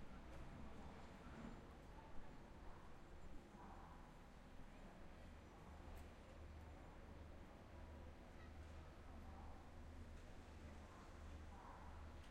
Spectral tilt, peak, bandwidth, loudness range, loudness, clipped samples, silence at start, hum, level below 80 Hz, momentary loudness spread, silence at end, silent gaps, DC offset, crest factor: -6 dB/octave; -40 dBFS; 13 kHz; 2 LU; -61 LUFS; under 0.1%; 0 s; none; -62 dBFS; 3 LU; 0 s; none; under 0.1%; 18 dB